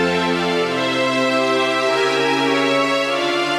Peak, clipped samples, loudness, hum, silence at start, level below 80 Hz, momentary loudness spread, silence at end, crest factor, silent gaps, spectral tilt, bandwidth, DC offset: -6 dBFS; under 0.1%; -17 LUFS; none; 0 s; -60 dBFS; 2 LU; 0 s; 12 dB; none; -4 dB/octave; 15 kHz; under 0.1%